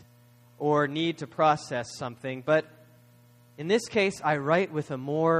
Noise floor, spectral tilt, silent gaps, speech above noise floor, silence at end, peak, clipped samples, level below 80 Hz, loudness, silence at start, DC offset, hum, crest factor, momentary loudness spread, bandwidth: -57 dBFS; -5.5 dB/octave; none; 30 dB; 0 s; -10 dBFS; under 0.1%; -68 dBFS; -27 LUFS; 0.6 s; under 0.1%; 60 Hz at -55 dBFS; 18 dB; 10 LU; 14.5 kHz